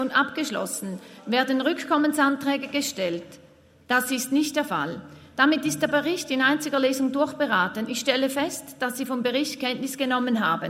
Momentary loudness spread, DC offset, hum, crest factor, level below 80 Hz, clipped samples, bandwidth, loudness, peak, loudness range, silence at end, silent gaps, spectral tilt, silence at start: 8 LU; under 0.1%; none; 20 dB; -70 dBFS; under 0.1%; 16 kHz; -24 LUFS; -6 dBFS; 2 LU; 0 s; none; -3 dB/octave; 0 s